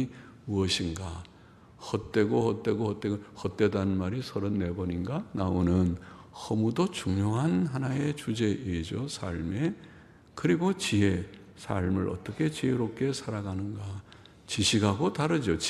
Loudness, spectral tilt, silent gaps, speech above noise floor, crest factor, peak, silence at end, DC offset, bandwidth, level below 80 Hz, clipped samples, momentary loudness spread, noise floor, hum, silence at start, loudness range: -30 LUFS; -5.5 dB/octave; none; 25 dB; 20 dB; -10 dBFS; 0 s; under 0.1%; 13 kHz; -52 dBFS; under 0.1%; 12 LU; -54 dBFS; none; 0 s; 2 LU